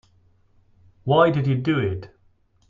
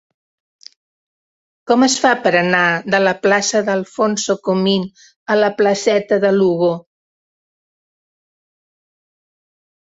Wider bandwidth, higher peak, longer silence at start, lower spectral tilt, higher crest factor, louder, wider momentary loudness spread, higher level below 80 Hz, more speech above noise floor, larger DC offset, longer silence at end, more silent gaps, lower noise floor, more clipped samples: second, 7 kHz vs 8 kHz; about the same, -4 dBFS vs -2 dBFS; second, 1.05 s vs 1.65 s; first, -9 dB/octave vs -4 dB/octave; about the same, 20 dB vs 16 dB; second, -21 LUFS vs -15 LUFS; first, 15 LU vs 6 LU; first, -56 dBFS vs -64 dBFS; second, 40 dB vs over 75 dB; neither; second, 0.65 s vs 3 s; second, none vs 5.16-5.26 s; second, -60 dBFS vs under -90 dBFS; neither